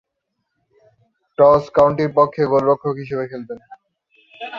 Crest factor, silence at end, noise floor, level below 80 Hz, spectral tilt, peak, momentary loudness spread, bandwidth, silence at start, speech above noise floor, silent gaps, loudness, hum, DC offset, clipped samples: 18 dB; 0 s; -75 dBFS; -54 dBFS; -8 dB/octave; 0 dBFS; 20 LU; 7 kHz; 1.4 s; 59 dB; none; -17 LUFS; none; under 0.1%; under 0.1%